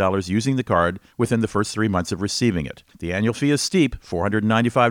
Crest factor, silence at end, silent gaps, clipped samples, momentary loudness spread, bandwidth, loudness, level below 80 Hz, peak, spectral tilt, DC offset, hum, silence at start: 16 dB; 0 s; none; under 0.1%; 7 LU; 17 kHz; -21 LUFS; -44 dBFS; -4 dBFS; -5.5 dB/octave; under 0.1%; none; 0 s